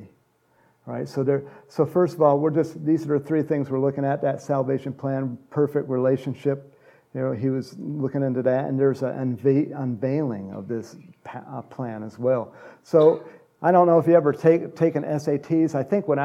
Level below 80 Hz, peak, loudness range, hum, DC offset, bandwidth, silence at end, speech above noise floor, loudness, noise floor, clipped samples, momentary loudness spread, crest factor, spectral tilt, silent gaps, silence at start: -72 dBFS; -4 dBFS; 6 LU; none; under 0.1%; 13 kHz; 0 s; 41 dB; -23 LUFS; -63 dBFS; under 0.1%; 15 LU; 18 dB; -9 dB/octave; none; 0 s